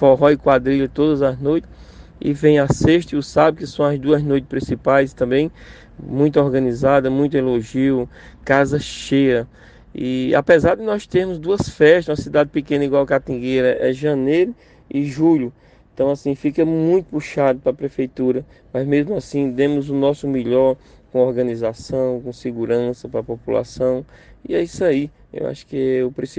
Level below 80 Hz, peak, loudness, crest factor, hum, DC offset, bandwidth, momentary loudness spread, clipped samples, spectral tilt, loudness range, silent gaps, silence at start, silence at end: -44 dBFS; 0 dBFS; -18 LUFS; 18 dB; none; under 0.1%; 9.4 kHz; 10 LU; under 0.1%; -7 dB/octave; 5 LU; none; 0 s; 0.1 s